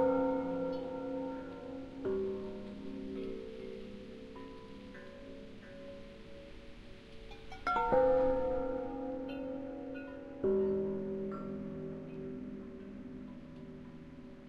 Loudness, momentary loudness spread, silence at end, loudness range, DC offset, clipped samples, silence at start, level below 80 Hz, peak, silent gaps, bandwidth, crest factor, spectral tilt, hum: -37 LUFS; 19 LU; 0 s; 15 LU; under 0.1%; under 0.1%; 0 s; -56 dBFS; -18 dBFS; none; 7.2 kHz; 20 dB; -8 dB/octave; none